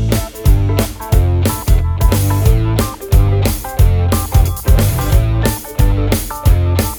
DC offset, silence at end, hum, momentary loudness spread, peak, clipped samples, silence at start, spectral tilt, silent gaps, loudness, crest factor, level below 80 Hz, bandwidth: under 0.1%; 0 s; none; 3 LU; 0 dBFS; under 0.1%; 0 s; -6 dB/octave; none; -14 LUFS; 12 dB; -16 dBFS; over 20 kHz